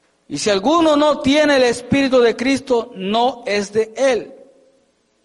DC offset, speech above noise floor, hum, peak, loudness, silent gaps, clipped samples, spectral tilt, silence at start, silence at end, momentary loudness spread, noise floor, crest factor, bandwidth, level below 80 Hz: under 0.1%; 44 dB; none; -6 dBFS; -16 LUFS; none; under 0.1%; -4 dB/octave; 0.3 s; 0.9 s; 8 LU; -60 dBFS; 12 dB; 11.5 kHz; -50 dBFS